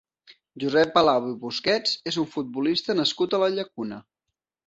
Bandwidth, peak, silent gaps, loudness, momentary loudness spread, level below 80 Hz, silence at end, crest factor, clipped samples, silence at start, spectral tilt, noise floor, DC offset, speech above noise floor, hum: 8.2 kHz; -4 dBFS; none; -24 LUFS; 12 LU; -66 dBFS; 0.65 s; 20 dB; under 0.1%; 0.55 s; -4.5 dB/octave; -84 dBFS; under 0.1%; 60 dB; none